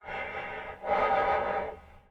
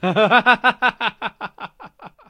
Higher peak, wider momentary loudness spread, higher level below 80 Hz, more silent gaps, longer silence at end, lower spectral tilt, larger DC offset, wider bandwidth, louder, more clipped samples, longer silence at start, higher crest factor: second, -14 dBFS vs 0 dBFS; second, 13 LU vs 21 LU; first, -54 dBFS vs -60 dBFS; neither; about the same, 0.1 s vs 0.2 s; about the same, -6 dB/octave vs -5.5 dB/octave; neither; second, 7.6 kHz vs 11 kHz; second, -30 LUFS vs -16 LUFS; neither; about the same, 0.05 s vs 0 s; about the same, 16 dB vs 20 dB